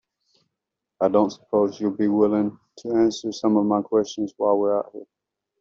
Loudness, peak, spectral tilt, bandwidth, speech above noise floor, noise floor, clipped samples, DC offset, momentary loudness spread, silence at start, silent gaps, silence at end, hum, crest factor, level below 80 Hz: -22 LUFS; -6 dBFS; -6.5 dB/octave; 7.6 kHz; 62 dB; -84 dBFS; under 0.1%; under 0.1%; 8 LU; 1 s; none; 0.6 s; none; 18 dB; -64 dBFS